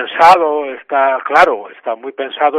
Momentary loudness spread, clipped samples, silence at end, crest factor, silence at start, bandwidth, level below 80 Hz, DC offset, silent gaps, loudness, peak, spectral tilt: 15 LU; 0.7%; 0 s; 12 dB; 0 s; 13.5 kHz; -54 dBFS; under 0.1%; none; -13 LUFS; 0 dBFS; -3.5 dB/octave